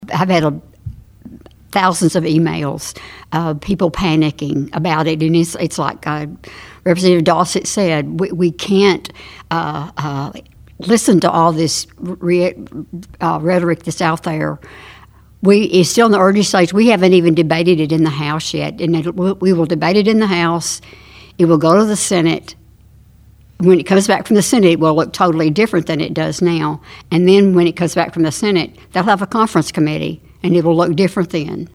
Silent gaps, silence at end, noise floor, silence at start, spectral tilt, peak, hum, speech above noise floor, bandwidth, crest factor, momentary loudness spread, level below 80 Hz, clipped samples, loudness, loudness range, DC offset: none; 0.1 s; -45 dBFS; 0 s; -5.5 dB/octave; 0 dBFS; none; 31 dB; 15.5 kHz; 14 dB; 12 LU; -44 dBFS; under 0.1%; -14 LUFS; 5 LU; under 0.1%